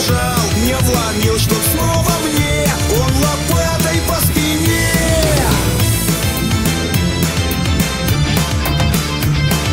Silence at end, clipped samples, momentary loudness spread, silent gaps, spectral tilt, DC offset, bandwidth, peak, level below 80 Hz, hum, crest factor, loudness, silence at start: 0 s; under 0.1%; 2 LU; none; -4.5 dB/octave; under 0.1%; 16.5 kHz; -2 dBFS; -24 dBFS; none; 14 dB; -14 LUFS; 0 s